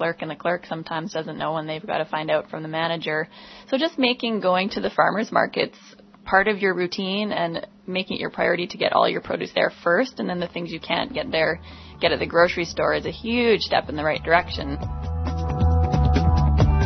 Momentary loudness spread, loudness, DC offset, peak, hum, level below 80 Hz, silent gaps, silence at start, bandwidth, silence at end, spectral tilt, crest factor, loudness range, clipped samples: 9 LU; -23 LUFS; under 0.1%; -2 dBFS; none; -32 dBFS; none; 0 s; 6.4 kHz; 0 s; -6.5 dB/octave; 20 dB; 3 LU; under 0.1%